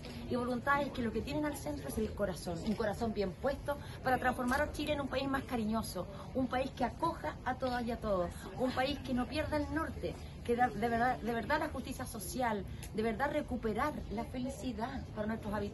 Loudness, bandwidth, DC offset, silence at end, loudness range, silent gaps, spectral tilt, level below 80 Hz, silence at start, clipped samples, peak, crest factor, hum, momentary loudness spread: -36 LUFS; 12.5 kHz; under 0.1%; 0 s; 2 LU; none; -5.5 dB/octave; -52 dBFS; 0 s; under 0.1%; -20 dBFS; 16 dB; none; 8 LU